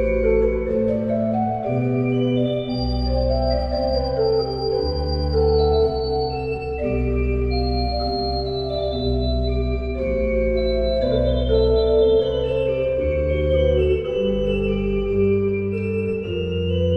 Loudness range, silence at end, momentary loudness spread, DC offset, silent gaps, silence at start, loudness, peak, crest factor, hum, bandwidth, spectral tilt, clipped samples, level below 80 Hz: 3 LU; 0 s; 6 LU; under 0.1%; none; 0 s; -21 LUFS; -6 dBFS; 14 dB; none; 5 kHz; -9 dB/octave; under 0.1%; -28 dBFS